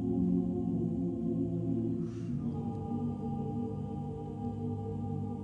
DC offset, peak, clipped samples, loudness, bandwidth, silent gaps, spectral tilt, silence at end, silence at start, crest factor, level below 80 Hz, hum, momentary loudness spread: under 0.1%; -20 dBFS; under 0.1%; -35 LUFS; 7.4 kHz; none; -11 dB/octave; 0 s; 0 s; 14 dB; -54 dBFS; none; 7 LU